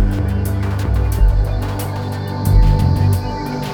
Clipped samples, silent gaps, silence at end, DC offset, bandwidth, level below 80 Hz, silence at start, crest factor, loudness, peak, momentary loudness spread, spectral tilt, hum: under 0.1%; none; 0 s; under 0.1%; 19 kHz; -18 dBFS; 0 s; 14 dB; -18 LUFS; -2 dBFS; 8 LU; -7 dB/octave; none